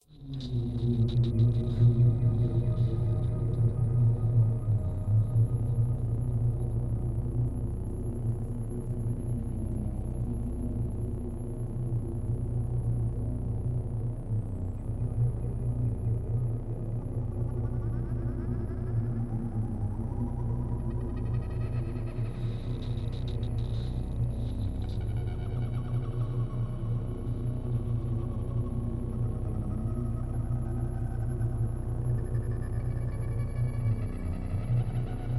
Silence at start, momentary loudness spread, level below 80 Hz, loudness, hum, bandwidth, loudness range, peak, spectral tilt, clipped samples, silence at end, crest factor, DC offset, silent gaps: 0.1 s; 8 LU; -36 dBFS; -31 LUFS; none; 11.5 kHz; 6 LU; -14 dBFS; -9.5 dB/octave; under 0.1%; 0 s; 16 dB; under 0.1%; none